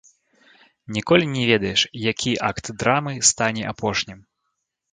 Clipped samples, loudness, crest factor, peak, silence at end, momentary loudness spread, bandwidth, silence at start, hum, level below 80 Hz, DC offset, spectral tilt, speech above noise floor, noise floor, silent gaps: under 0.1%; -21 LUFS; 22 dB; -2 dBFS; 0.75 s; 9 LU; 9.6 kHz; 0.9 s; none; -52 dBFS; under 0.1%; -3 dB/octave; 55 dB; -77 dBFS; none